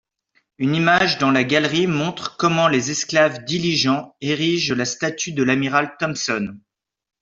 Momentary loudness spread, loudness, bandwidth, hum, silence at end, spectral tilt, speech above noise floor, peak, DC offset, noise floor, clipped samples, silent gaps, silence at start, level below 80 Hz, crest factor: 7 LU; -19 LUFS; 7.8 kHz; none; 0.65 s; -4 dB/octave; 46 dB; -2 dBFS; under 0.1%; -66 dBFS; under 0.1%; none; 0.6 s; -58 dBFS; 18 dB